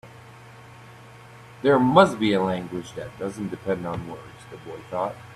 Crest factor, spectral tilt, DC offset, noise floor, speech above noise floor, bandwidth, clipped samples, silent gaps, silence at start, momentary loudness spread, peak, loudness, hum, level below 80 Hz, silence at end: 22 dB; -6.5 dB/octave; under 0.1%; -46 dBFS; 22 dB; 13.5 kHz; under 0.1%; none; 0.05 s; 22 LU; -4 dBFS; -23 LUFS; none; -58 dBFS; 0 s